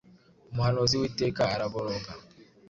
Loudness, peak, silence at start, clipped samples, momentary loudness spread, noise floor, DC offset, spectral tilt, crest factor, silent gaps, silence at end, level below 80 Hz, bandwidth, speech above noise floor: -29 LUFS; -10 dBFS; 0.5 s; under 0.1%; 13 LU; -57 dBFS; under 0.1%; -5 dB/octave; 20 dB; none; 0.25 s; -52 dBFS; 7.8 kHz; 29 dB